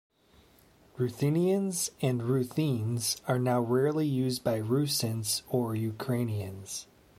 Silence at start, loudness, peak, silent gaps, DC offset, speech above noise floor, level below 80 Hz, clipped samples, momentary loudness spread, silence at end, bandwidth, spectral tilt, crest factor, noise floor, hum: 0.95 s; -30 LUFS; -14 dBFS; none; under 0.1%; 32 dB; -66 dBFS; under 0.1%; 7 LU; 0.35 s; 16 kHz; -5.5 dB/octave; 16 dB; -61 dBFS; none